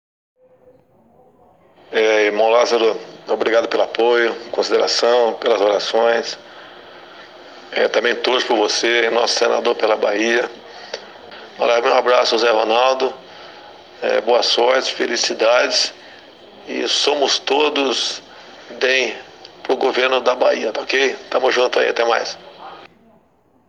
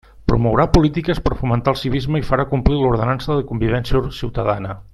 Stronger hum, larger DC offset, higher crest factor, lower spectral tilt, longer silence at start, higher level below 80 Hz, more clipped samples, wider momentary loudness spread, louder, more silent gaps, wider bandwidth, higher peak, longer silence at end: neither; neither; about the same, 18 dB vs 18 dB; second, -1 dB/octave vs -7.5 dB/octave; first, 1.9 s vs 0.2 s; second, -70 dBFS vs -28 dBFS; neither; first, 17 LU vs 6 LU; about the same, -17 LUFS vs -19 LUFS; neither; second, 10.5 kHz vs 12.5 kHz; about the same, 0 dBFS vs 0 dBFS; first, 0.85 s vs 0.1 s